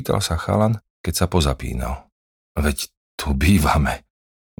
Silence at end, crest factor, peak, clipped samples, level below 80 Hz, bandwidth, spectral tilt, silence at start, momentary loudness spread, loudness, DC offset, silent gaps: 0.6 s; 18 dB; -4 dBFS; under 0.1%; -28 dBFS; 19.5 kHz; -5.5 dB/octave; 0 s; 13 LU; -21 LUFS; under 0.1%; 0.90-1.04 s, 2.12-2.55 s, 2.97-3.18 s